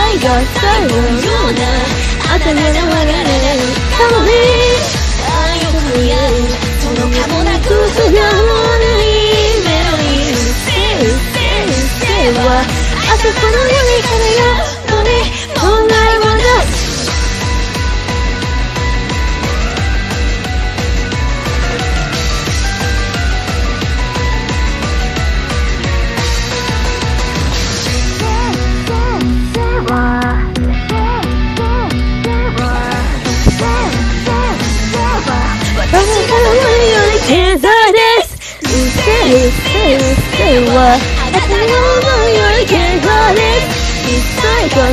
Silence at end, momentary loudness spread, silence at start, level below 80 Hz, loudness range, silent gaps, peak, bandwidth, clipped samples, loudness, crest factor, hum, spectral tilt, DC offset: 0 s; 7 LU; 0 s; -16 dBFS; 6 LU; none; 0 dBFS; 15 kHz; under 0.1%; -12 LUFS; 12 dB; none; -4.5 dB/octave; under 0.1%